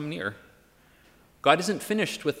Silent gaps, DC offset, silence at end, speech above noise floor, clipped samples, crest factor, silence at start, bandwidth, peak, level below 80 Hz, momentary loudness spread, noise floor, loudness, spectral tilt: none; under 0.1%; 0 s; 33 dB; under 0.1%; 24 dB; 0 s; 16 kHz; -4 dBFS; -66 dBFS; 11 LU; -59 dBFS; -26 LUFS; -4 dB/octave